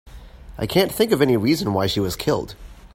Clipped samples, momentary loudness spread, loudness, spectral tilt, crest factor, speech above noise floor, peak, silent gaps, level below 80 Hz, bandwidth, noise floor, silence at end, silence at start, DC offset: under 0.1%; 12 LU; -20 LUFS; -5.5 dB/octave; 18 dB; 20 dB; -4 dBFS; none; -42 dBFS; 16.5 kHz; -40 dBFS; 0.1 s; 0.05 s; under 0.1%